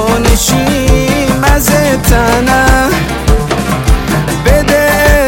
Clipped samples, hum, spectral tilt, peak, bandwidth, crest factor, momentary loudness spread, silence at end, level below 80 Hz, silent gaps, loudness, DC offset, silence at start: under 0.1%; none; -4.5 dB/octave; 0 dBFS; 17.5 kHz; 8 dB; 4 LU; 0 s; -14 dBFS; none; -10 LUFS; under 0.1%; 0 s